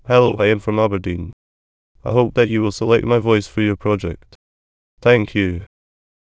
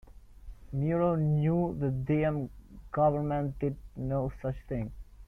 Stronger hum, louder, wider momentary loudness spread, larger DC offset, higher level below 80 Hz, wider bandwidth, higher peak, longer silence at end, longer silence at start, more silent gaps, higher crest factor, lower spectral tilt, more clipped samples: neither; first, -17 LUFS vs -31 LUFS; first, 14 LU vs 11 LU; neither; first, -40 dBFS vs -48 dBFS; first, 8 kHz vs 3.4 kHz; first, 0 dBFS vs -16 dBFS; first, 0.65 s vs 0 s; about the same, 0.05 s vs 0.05 s; first, 1.33-1.95 s, 4.35-4.97 s vs none; about the same, 18 dB vs 16 dB; second, -7 dB/octave vs -10.5 dB/octave; neither